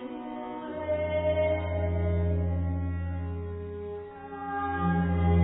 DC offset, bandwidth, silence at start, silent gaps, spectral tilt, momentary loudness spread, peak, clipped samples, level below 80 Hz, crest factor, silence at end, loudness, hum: under 0.1%; 3.9 kHz; 0 s; none; -12 dB/octave; 11 LU; -14 dBFS; under 0.1%; -46 dBFS; 16 dB; 0 s; -30 LUFS; none